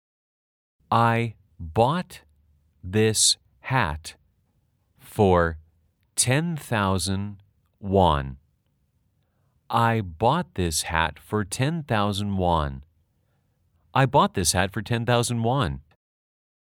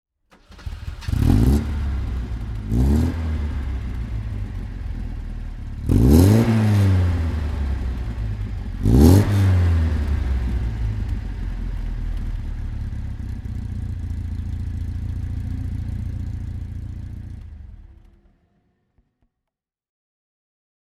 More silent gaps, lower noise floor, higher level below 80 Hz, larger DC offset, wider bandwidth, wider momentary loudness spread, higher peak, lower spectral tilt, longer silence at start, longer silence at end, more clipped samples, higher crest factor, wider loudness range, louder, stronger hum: neither; second, -69 dBFS vs -85 dBFS; second, -46 dBFS vs -26 dBFS; neither; first, 18 kHz vs 14.5 kHz; second, 14 LU vs 17 LU; second, -4 dBFS vs 0 dBFS; second, -4.5 dB/octave vs -8 dB/octave; first, 0.9 s vs 0.5 s; second, 0.95 s vs 2.95 s; neither; about the same, 22 dB vs 20 dB; second, 3 LU vs 13 LU; about the same, -23 LUFS vs -22 LUFS; neither